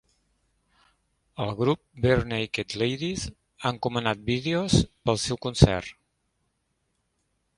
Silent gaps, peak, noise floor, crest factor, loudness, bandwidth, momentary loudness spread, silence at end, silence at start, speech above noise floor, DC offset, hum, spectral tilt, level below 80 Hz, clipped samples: none; 0 dBFS; -75 dBFS; 28 dB; -26 LUFS; 11.5 kHz; 11 LU; 1.65 s; 1.4 s; 50 dB; under 0.1%; none; -5.5 dB/octave; -42 dBFS; under 0.1%